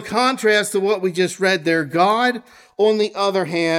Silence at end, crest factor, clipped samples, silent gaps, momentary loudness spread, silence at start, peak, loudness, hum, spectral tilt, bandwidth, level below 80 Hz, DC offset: 0 s; 16 dB; under 0.1%; none; 4 LU; 0 s; -2 dBFS; -18 LUFS; none; -4 dB/octave; 16 kHz; -66 dBFS; under 0.1%